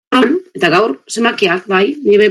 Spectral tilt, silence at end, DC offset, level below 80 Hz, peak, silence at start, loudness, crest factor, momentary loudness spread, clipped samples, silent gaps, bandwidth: -4.5 dB/octave; 0 s; under 0.1%; -58 dBFS; 0 dBFS; 0.1 s; -13 LUFS; 12 dB; 4 LU; under 0.1%; none; 12 kHz